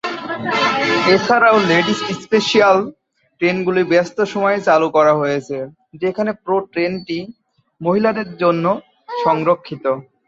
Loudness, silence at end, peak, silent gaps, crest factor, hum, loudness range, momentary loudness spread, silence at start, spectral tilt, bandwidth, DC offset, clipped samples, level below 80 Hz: -16 LUFS; 0.25 s; -2 dBFS; none; 16 dB; none; 5 LU; 12 LU; 0.05 s; -5 dB/octave; 8 kHz; under 0.1%; under 0.1%; -60 dBFS